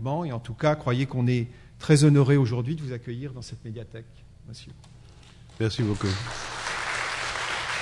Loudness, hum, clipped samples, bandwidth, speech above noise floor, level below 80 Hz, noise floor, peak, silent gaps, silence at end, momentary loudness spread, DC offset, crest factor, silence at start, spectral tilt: -26 LUFS; none; under 0.1%; 11.5 kHz; 24 dB; -52 dBFS; -49 dBFS; -6 dBFS; none; 0 s; 20 LU; under 0.1%; 20 dB; 0 s; -6 dB/octave